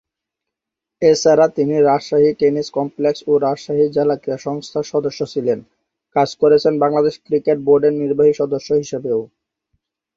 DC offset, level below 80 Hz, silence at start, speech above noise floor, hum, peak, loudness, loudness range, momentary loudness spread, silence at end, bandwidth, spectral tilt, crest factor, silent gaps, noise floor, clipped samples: under 0.1%; -58 dBFS; 1 s; 68 dB; none; -2 dBFS; -17 LUFS; 4 LU; 9 LU; 0.9 s; 7.6 kHz; -6 dB/octave; 16 dB; none; -84 dBFS; under 0.1%